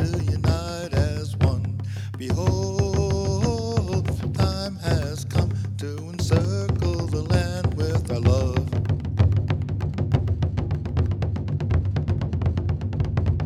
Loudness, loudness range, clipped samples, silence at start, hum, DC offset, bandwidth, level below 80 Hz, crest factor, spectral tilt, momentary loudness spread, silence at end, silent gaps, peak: -24 LUFS; 2 LU; under 0.1%; 0 s; none; under 0.1%; 12.5 kHz; -34 dBFS; 18 dB; -7 dB/octave; 5 LU; 0 s; none; -6 dBFS